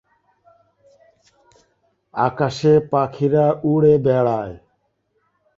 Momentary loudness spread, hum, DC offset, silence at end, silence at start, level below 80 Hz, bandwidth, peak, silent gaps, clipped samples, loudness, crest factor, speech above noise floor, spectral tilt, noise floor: 9 LU; none; under 0.1%; 1 s; 2.15 s; -54 dBFS; 7.6 kHz; -2 dBFS; none; under 0.1%; -18 LUFS; 18 dB; 51 dB; -8 dB/octave; -68 dBFS